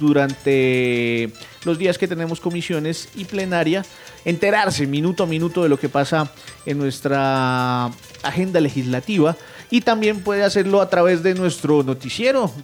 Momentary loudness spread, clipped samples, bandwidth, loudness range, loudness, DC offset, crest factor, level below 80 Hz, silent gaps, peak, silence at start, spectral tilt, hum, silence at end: 9 LU; under 0.1%; 17 kHz; 3 LU; -20 LUFS; under 0.1%; 14 dB; -56 dBFS; none; -6 dBFS; 0 s; -6 dB/octave; none; 0 s